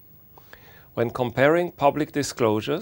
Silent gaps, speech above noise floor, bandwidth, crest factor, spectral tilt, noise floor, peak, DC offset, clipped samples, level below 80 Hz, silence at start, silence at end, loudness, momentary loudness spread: none; 28 dB; 16.5 kHz; 22 dB; -5.5 dB/octave; -50 dBFS; -4 dBFS; under 0.1%; under 0.1%; -56 dBFS; 0.95 s; 0 s; -23 LUFS; 8 LU